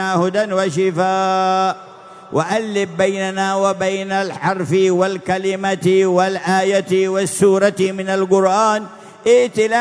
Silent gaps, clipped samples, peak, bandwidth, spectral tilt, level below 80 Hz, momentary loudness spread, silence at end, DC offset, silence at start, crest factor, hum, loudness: none; under 0.1%; -2 dBFS; 11 kHz; -5 dB/octave; -62 dBFS; 6 LU; 0 s; under 0.1%; 0 s; 14 dB; none; -17 LUFS